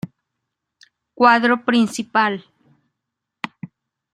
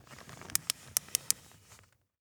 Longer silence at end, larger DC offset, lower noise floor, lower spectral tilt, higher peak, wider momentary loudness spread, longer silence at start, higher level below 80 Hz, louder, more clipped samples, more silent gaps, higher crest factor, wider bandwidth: second, 0.5 s vs 0.85 s; neither; first, -81 dBFS vs -61 dBFS; first, -4.5 dB/octave vs 0.5 dB/octave; about the same, 0 dBFS vs 0 dBFS; first, 22 LU vs 13 LU; about the same, 0.05 s vs 0.1 s; about the same, -68 dBFS vs -68 dBFS; first, -17 LUFS vs -33 LUFS; neither; neither; second, 20 dB vs 38 dB; second, 13 kHz vs over 20 kHz